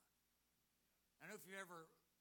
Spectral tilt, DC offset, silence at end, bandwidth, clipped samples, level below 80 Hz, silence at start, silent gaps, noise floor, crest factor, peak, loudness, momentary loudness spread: -3 dB/octave; under 0.1%; 0.2 s; 19.5 kHz; under 0.1%; under -90 dBFS; 0 s; none; -85 dBFS; 24 dB; -38 dBFS; -57 LUFS; 9 LU